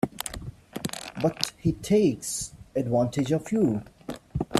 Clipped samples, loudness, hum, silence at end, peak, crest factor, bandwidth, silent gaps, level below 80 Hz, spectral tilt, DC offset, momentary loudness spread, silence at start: under 0.1%; -27 LUFS; none; 0 s; -2 dBFS; 26 dB; 15.5 kHz; none; -50 dBFS; -5.5 dB/octave; under 0.1%; 13 LU; 0.05 s